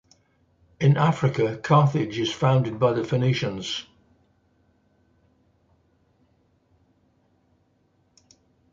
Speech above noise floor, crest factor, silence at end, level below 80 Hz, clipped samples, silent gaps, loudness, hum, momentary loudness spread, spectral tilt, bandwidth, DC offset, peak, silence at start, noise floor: 44 dB; 20 dB; 4.9 s; -60 dBFS; under 0.1%; none; -23 LUFS; none; 8 LU; -7 dB/octave; 7.6 kHz; under 0.1%; -6 dBFS; 0.8 s; -66 dBFS